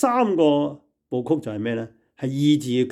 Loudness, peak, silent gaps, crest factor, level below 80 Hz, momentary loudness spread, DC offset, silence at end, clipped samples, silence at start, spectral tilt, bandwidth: -23 LUFS; -6 dBFS; none; 14 dB; -68 dBFS; 12 LU; under 0.1%; 0 s; under 0.1%; 0 s; -6.5 dB/octave; 12.5 kHz